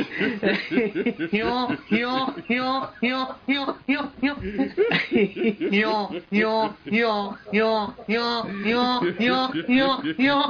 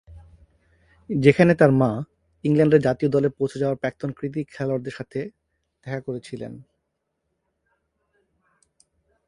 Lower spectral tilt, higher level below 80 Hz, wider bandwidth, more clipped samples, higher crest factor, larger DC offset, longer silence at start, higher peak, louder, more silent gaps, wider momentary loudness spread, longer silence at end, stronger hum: second, -3 dB/octave vs -8 dB/octave; about the same, -54 dBFS vs -54 dBFS; second, 6.8 kHz vs 11 kHz; neither; second, 14 dB vs 24 dB; neither; about the same, 0 s vs 0.1 s; second, -10 dBFS vs 0 dBFS; about the same, -23 LUFS vs -22 LUFS; neither; second, 5 LU vs 18 LU; second, 0 s vs 2.65 s; neither